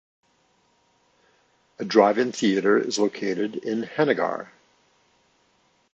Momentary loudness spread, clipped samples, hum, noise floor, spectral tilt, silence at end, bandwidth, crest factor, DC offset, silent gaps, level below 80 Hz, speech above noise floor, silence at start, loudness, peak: 10 LU; under 0.1%; none; -65 dBFS; -4.5 dB/octave; 1.5 s; 8.2 kHz; 22 dB; under 0.1%; none; -76 dBFS; 43 dB; 1.8 s; -23 LUFS; -4 dBFS